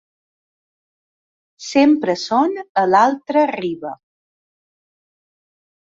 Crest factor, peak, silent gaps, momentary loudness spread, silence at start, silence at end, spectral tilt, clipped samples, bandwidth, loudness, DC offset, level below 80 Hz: 18 dB; -2 dBFS; 2.69-2.75 s; 13 LU; 1.6 s; 2 s; -5 dB/octave; under 0.1%; 7.6 kHz; -17 LUFS; under 0.1%; -66 dBFS